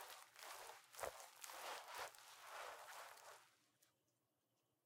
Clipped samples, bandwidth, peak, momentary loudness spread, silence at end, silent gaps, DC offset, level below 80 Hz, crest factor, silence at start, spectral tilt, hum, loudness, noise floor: under 0.1%; 17 kHz; -32 dBFS; 8 LU; 0.95 s; none; under 0.1%; -88 dBFS; 26 dB; 0 s; 0 dB/octave; none; -55 LUFS; -88 dBFS